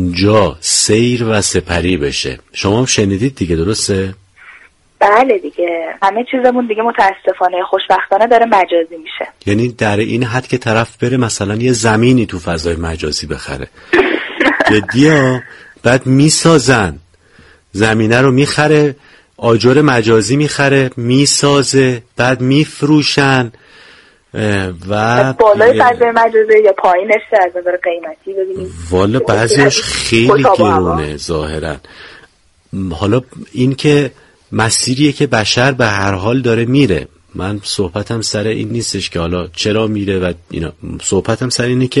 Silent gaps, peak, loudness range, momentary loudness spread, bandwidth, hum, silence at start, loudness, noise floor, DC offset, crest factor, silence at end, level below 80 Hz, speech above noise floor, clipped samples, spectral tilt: none; 0 dBFS; 5 LU; 11 LU; 11.5 kHz; none; 0 s; -12 LUFS; -48 dBFS; under 0.1%; 12 dB; 0 s; -38 dBFS; 36 dB; under 0.1%; -4.5 dB/octave